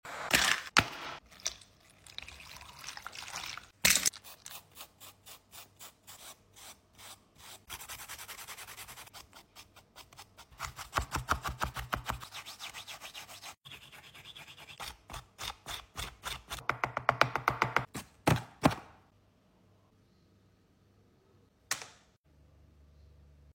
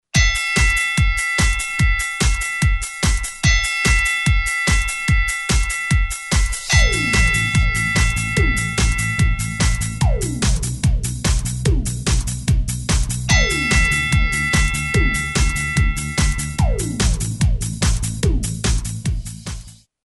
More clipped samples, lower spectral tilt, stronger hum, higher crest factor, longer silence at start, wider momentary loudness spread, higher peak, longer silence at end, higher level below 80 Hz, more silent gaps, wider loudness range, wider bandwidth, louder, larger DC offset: neither; about the same, -2.5 dB/octave vs -3.5 dB/octave; neither; first, 32 dB vs 14 dB; about the same, 0.05 s vs 0.15 s; first, 23 LU vs 5 LU; second, -8 dBFS vs -4 dBFS; second, 0.05 s vs 0.35 s; second, -56 dBFS vs -22 dBFS; first, 13.57-13.61 s, 22.17-22.24 s vs none; first, 14 LU vs 3 LU; first, 16.5 kHz vs 12 kHz; second, -34 LUFS vs -18 LUFS; neither